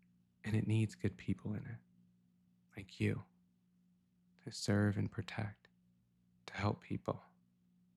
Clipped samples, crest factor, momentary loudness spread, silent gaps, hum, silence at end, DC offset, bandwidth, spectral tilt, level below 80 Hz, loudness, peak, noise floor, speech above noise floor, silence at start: under 0.1%; 18 dB; 19 LU; none; none; 0.75 s; under 0.1%; 12 kHz; -6.5 dB/octave; -70 dBFS; -40 LUFS; -22 dBFS; -74 dBFS; 36 dB; 0.45 s